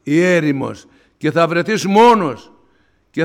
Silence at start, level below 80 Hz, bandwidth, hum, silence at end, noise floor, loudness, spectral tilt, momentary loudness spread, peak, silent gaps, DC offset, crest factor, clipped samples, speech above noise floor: 0.05 s; -56 dBFS; 16 kHz; none; 0 s; -58 dBFS; -14 LUFS; -6 dB/octave; 16 LU; -2 dBFS; none; under 0.1%; 14 dB; under 0.1%; 44 dB